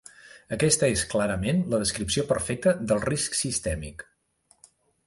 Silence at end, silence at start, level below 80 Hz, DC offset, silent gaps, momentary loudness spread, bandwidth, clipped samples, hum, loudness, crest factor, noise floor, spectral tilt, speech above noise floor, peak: 1.05 s; 0.25 s; -46 dBFS; under 0.1%; none; 11 LU; 11.5 kHz; under 0.1%; none; -25 LUFS; 18 dB; -65 dBFS; -4 dB/octave; 40 dB; -8 dBFS